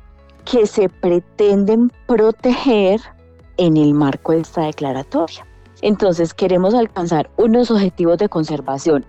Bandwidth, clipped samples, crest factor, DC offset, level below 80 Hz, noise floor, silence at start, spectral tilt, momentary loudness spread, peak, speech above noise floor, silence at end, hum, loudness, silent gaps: 8.4 kHz; under 0.1%; 10 dB; under 0.1%; -46 dBFS; -37 dBFS; 0.45 s; -7 dB/octave; 8 LU; -6 dBFS; 22 dB; 0.05 s; none; -16 LUFS; none